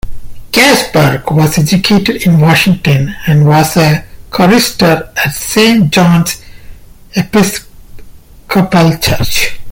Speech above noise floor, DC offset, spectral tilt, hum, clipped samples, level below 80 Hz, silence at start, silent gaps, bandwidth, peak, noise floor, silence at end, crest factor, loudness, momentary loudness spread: 23 dB; under 0.1%; -5 dB/octave; none; under 0.1%; -30 dBFS; 0.05 s; none; 17 kHz; 0 dBFS; -32 dBFS; 0 s; 10 dB; -9 LUFS; 7 LU